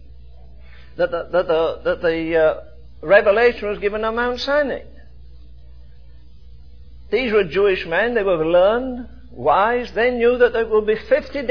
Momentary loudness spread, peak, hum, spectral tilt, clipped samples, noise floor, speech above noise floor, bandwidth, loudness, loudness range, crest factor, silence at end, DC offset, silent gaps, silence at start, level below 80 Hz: 9 LU; 0 dBFS; none; -6.5 dB/octave; under 0.1%; -44 dBFS; 27 dB; 5.4 kHz; -18 LUFS; 7 LU; 18 dB; 0 s; 1%; none; 0.1 s; -42 dBFS